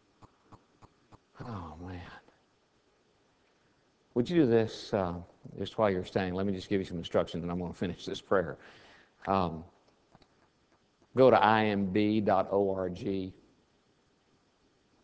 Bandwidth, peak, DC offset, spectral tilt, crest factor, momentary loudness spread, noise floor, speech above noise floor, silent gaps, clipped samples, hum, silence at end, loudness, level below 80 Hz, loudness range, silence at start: 8 kHz; -8 dBFS; under 0.1%; -7 dB/octave; 24 dB; 19 LU; -70 dBFS; 40 dB; none; under 0.1%; none; 1.7 s; -30 LUFS; -56 dBFS; 15 LU; 0.5 s